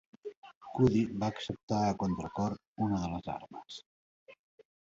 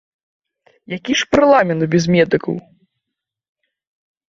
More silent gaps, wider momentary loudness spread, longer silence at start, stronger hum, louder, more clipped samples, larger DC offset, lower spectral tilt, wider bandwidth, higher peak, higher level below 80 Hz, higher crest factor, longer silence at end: first, 0.37-0.42 s, 0.55-0.61 s, 1.63-1.68 s, 2.67-2.76 s, 3.86-4.26 s vs none; first, 20 LU vs 16 LU; second, 0.25 s vs 0.9 s; neither; second, -33 LUFS vs -15 LUFS; neither; neither; first, -7 dB/octave vs -5.5 dB/octave; about the same, 7.8 kHz vs 7.6 kHz; second, -14 dBFS vs 0 dBFS; about the same, -56 dBFS vs -52 dBFS; about the same, 20 dB vs 18 dB; second, 0.5 s vs 1.75 s